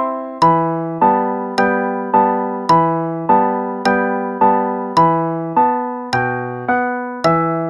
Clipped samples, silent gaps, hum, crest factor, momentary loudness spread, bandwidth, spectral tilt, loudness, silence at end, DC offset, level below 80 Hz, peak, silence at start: under 0.1%; none; none; 14 dB; 6 LU; 11.5 kHz; -7 dB/octave; -16 LUFS; 0 s; under 0.1%; -54 dBFS; -2 dBFS; 0 s